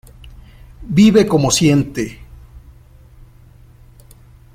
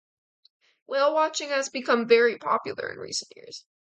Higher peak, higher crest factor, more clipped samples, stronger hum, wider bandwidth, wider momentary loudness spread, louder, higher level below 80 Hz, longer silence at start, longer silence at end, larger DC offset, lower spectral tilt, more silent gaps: first, -2 dBFS vs -6 dBFS; about the same, 16 dB vs 20 dB; neither; neither; first, 16 kHz vs 9.2 kHz; second, 14 LU vs 21 LU; first, -14 LUFS vs -25 LUFS; first, -40 dBFS vs -78 dBFS; second, 0.25 s vs 0.9 s; first, 2.3 s vs 0.35 s; neither; first, -5.5 dB/octave vs -2 dB/octave; neither